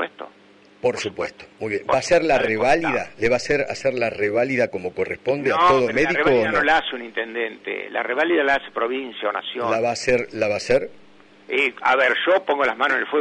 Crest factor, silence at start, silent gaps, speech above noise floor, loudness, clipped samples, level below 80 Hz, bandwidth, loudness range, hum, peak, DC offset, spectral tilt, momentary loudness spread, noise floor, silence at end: 14 dB; 0 s; none; 30 dB; -21 LUFS; under 0.1%; -52 dBFS; 10.5 kHz; 3 LU; none; -8 dBFS; under 0.1%; -4 dB/octave; 10 LU; -51 dBFS; 0 s